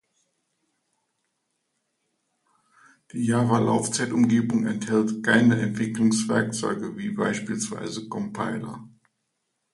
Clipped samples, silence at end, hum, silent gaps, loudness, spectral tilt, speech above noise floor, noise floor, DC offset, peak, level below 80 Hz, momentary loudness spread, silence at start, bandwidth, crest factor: under 0.1%; 0.85 s; none; none; -24 LUFS; -5 dB/octave; 54 dB; -78 dBFS; under 0.1%; -6 dBFS; -64 dBFS; 11 LU; 3.15 s; 11.5 kHz; 20 dB